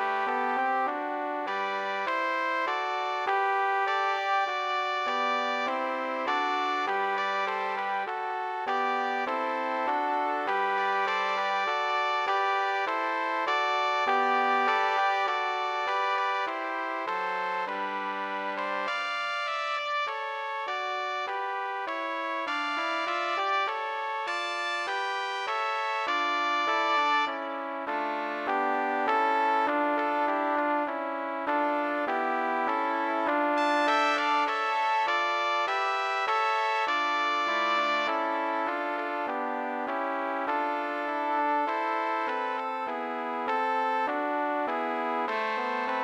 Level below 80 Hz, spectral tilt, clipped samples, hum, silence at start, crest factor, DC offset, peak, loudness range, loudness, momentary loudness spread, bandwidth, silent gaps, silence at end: -84 dBFS; -2 dB/octave; under 0.1%; none; 0 s; 16 dB; under 0.1%; -12 dBFS; 4 LU; -28 LUFS; 6 LU; 15 kHz; none; 0 s